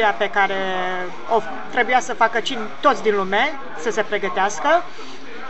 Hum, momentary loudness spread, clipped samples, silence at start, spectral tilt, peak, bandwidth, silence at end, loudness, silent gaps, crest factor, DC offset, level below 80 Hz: none; 8 LU; under 0.1%; 0 s; -3 dB/octave; -2 dBFS; 8.2 kHz; 0 s; -20 LUFS; none; 18 dB; 4%; -66 dBFS